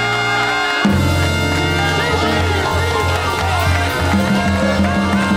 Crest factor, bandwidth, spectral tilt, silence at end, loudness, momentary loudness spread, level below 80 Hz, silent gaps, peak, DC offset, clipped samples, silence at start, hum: 12 dB; 16.5 kHz; -5 dB/octave; 0 s; -15 LUFS; 2 LU; -30 dBFS; none; -4 dBFS; under 0.1%; under 0.1%; 0 s; none